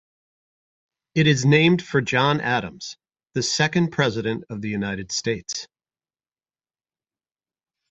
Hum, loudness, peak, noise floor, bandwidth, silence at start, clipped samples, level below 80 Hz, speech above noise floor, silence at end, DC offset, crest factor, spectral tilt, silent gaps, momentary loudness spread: none; -22 LUFS; -4 dBFS; under -90 dBFS; 8.2 kHz; 1.15 s; under 0.1%; -56 dBFS; over 69 dB; 2.25 s; under 0.1%; 20 dB; -4.5 dB/octave; none; 15 LU